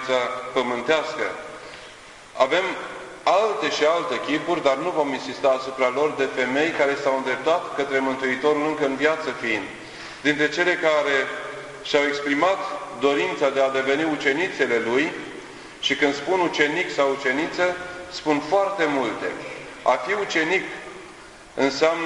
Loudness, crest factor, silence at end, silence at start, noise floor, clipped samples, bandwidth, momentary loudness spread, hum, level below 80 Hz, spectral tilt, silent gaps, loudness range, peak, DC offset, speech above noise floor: -22 LUFS; 20 dB; 0 s; 0 s; -44 dBFS; under 0.1%; 11.5 kHz; 14 LU; none; -60 dBFS; -3.5 dB/octave; none; 2 LU; -2 dBFS; under 0.1%; 21 dB